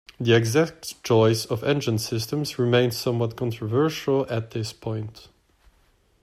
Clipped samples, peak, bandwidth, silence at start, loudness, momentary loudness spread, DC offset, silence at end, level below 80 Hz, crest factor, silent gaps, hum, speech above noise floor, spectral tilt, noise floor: under 0.1%; -6 dBFS; 15.5 kHz; 0.2 s; -24 LUFS; 12 LU; under 0.1%; 1.05 s; -58 dBFS; 18 dB; none; none; 39 dB; -5.5 dB/octave; -62 dBFS